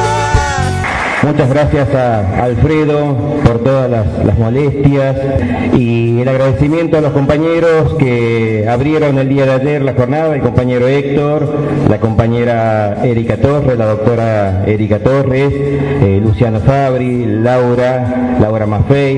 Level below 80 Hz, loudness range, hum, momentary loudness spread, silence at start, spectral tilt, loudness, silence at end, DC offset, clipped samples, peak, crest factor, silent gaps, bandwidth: -28 dBFS; 1 LU; none; 3 LU; 0 s; -8 dB/octave; -12 LUFS; 0 s; under 0.1%; under 0.1%; 0 dBFS; 10 dB; none; 10.5 kHz